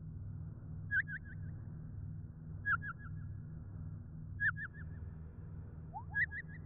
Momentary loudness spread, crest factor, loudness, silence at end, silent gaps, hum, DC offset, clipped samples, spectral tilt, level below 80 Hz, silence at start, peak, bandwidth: 13 LU; 18 dB; -42 LUFS; 0 s; none; none; under 0.1%; under 0.1%; -2 dB/octave; -54 dBFS; 0 s; -26 dBFS; 3.7 kHz